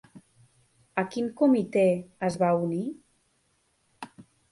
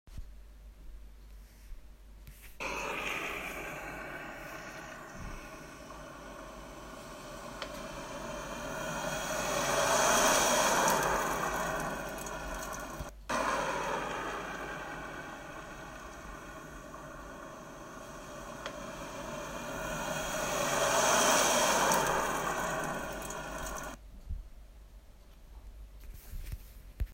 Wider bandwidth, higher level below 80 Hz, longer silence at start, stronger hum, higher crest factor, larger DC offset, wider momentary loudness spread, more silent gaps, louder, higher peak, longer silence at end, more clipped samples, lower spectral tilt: second, 11.5 kHz vs 16 kHz; second, -68 dBFS vs -50 dBFS; about the same, 0.15 s vs 0.05 s; neither; about the same, 18 dB vs 22 dB; neither; about the same, 22 LU vs 21 LU; neither; first, -26 LUFS vs -32 LUFS; first, -10 dBFS vs -14 dBFS; first, 0.3 s vs 0 s; neither; first, -7.5 dB/octave vs -2 dB/octave